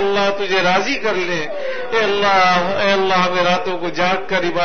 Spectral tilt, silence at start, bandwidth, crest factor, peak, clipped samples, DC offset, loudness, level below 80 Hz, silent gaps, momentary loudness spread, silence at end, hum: -4 dB/octave; 0 s; 6.6 kHz; 16 dB; -2 dBFS; under 0.1%; 4%; -17 LUFS; -48 dBFS; none; 7 LU; 0 s; none